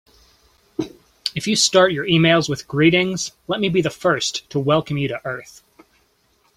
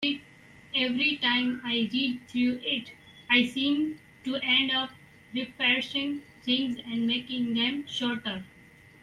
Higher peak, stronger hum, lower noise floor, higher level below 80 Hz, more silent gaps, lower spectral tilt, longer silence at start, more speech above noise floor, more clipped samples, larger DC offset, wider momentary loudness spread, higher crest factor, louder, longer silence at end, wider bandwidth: first, 0 dBFS vs -8 dBFS; neither; first, -62 dBFS vs -54 dBFS; first, -56 dBFS vs -68 dBFS; neither; about the same, -4 dB/octave vs -4 dB/octave; first, 0.8 s vs 0 s; first, 43 dB vs 26 dB; neither; neither; first, 15 LU vs 12 LU; about the same, 20 dB vs 20 dB; first, -19 LUFS vs -27 LUFS; first, 1.1 s vs 0.55 s; first, 15.5 kHz vs 11.5 kHz